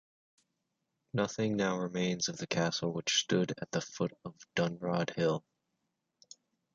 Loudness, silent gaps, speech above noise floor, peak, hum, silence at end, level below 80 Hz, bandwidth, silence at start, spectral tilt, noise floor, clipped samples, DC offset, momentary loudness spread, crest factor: -33 LUFS; none; 51 dB; -14 dBFS; none; 1.35 s; -70 dBFS; 7.6 kHz; 1.15 s; -4 dB/octave; -84 dBFS; under 0.1%; under 0.1%; 7 LU; 20 dB